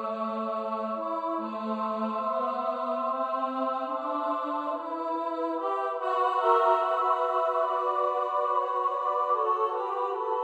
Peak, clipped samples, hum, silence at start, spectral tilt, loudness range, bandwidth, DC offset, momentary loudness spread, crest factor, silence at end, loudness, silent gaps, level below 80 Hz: -10 dBFS; under 0.1%; none; 0 s; -6 dB/octave; 4 LU; 8.6 kHz; under 0.1%; 6 LU; 18 dB; 0 s; -28 LUFS; none; -82 dBFS